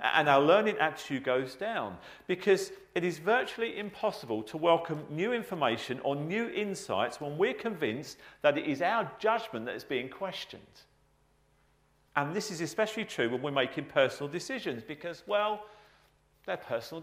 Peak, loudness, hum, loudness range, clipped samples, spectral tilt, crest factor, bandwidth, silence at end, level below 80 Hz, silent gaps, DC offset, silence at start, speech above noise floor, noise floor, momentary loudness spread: -10 dBFS; -31 LUFS; none; 5 LU; under 0.1%; -4.5 dB/octave; 22 dB; 15.5 kHz; 0 s; -72 dBFS; none; under 0.1%; 0 s; 37 dB; -68 dBFS; 10 LU